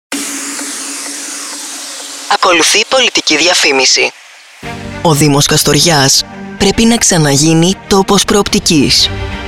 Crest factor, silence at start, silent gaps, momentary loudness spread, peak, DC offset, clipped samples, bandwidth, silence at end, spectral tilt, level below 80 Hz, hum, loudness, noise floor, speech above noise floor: 12 dB; 0.1 s; none; 14 LU; 0 dBFS; under 0.1%; under 0.1%; 17 kHz; 0 s; -3 dB/octave; -34 dBFS; none; -9 LUFS; -33 dBFS; 24 dB